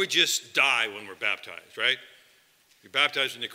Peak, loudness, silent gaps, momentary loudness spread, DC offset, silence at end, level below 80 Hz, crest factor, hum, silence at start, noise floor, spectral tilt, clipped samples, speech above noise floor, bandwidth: -8 dBFS; -25 LUFS; none; 10 LU; under 0.1%; 0 s; -84 dBFS; 22 dB; none; 0 s; -62 dBFS; 0 dB/octave; under 0.1%; 35 dB; 16 kHz